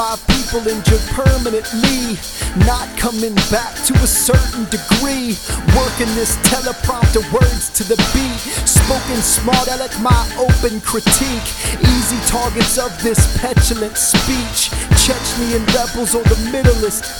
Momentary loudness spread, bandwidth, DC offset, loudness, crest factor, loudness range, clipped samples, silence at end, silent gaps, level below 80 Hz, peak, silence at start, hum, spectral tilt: 6 LU; over 20 kHz; under 0.1%; -15 LUFS; 14 dB; 1 LU; under 0.1%; 0 s; none; -22 dBFS; 0 dBFS; 0 s; none; -4 dB/octave